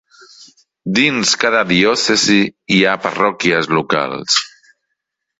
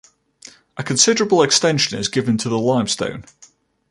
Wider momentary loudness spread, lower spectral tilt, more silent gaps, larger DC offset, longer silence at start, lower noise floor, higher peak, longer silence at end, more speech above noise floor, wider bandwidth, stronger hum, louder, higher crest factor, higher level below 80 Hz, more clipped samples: second, 6 LU vs 14 LU; about the same, -3 dB/octave vs -3 dB/octave; neither; neither; second, 0.4 s vs 0.75 s; first, -75 dBFS vs -46 dBFS; about the same, -2 dBFS vs 0 dBFS; first, 0.9 s vs 0.45 s; first, 61 dB vs 28 dB; second, 8 kHz vs 11.5 kHz; neither; first, -14 LUFS vs -17 LUFS; about the same, 16 dB vs 20 dB; about the same, -54 dBFS vs -56 dBFS; neither